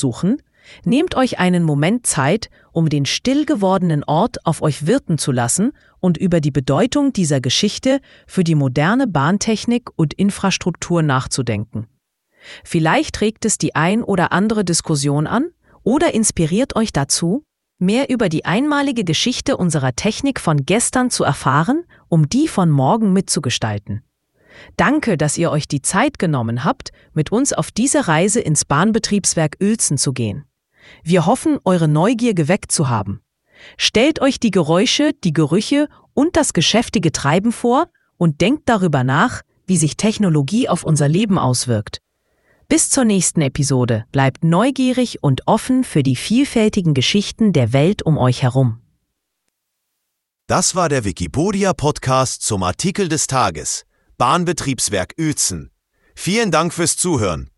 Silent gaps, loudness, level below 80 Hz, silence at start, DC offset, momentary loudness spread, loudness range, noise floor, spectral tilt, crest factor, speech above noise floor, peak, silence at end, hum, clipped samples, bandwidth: none; -17 LUFS; -44 dBFS; 0 s; under 0.1%; 6 LU; 3 LU; -76 dBFS; -4.5 dB/octave; 16 dB; 60 dB; 0 dBFS; 0.1 s; none; under 0.1%; 12 kHz